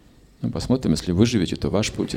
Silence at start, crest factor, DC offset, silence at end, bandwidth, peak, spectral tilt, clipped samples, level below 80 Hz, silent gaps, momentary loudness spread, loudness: 0.4 s; 20 dB; under 0.1%; 0 s; 16 kHz; -4 dBFS; -6 dB/octave; under 0.1%; -40 dBFS; none; 9 LU; -22 LUFS